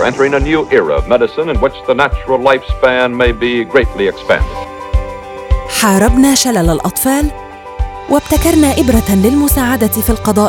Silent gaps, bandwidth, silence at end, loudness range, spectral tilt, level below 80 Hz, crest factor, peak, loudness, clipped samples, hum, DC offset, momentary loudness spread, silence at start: none; 18 kHz; 0 s; 2 LU; -4.5 dB/octave; -22 dBFS; 12 dB; 0 dBFS; -12 LUFS; 0.1%; none; under 0.1%; 10 LU; 0 s